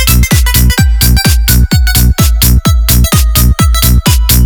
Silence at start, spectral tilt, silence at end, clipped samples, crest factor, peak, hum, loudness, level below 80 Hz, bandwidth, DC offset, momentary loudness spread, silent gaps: 0 s; -4 dB/octave; 0 s; 1%; 6 dB; 0 dBFS; none; -8 LUFS; -8 dBFS; over 20 kHz; 0.9%; 1 LU; none